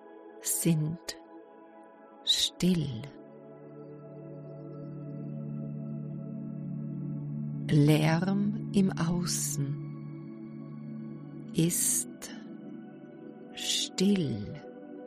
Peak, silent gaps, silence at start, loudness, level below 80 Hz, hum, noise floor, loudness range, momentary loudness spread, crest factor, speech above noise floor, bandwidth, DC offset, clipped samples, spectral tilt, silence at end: -12 dBFS; none; 0 s; -30 LUFS; -62 dBFS; none; -52 dBFS; 11 LU; 21 LU; 20 dB; 25 dB; 15 kHz; under 0.1%; under 0.1%; -4.5 dB/octave; 0 s